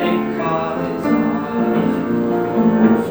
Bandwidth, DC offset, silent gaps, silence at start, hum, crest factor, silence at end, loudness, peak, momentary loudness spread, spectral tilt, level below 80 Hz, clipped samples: over 20 kHz; 0.1%; none; 0 s; none; 16 dB; 0 s; -18 LUFS; -2 dBFS; 6 LU; -8 dB/octave; -50 dBFS; under 0.1%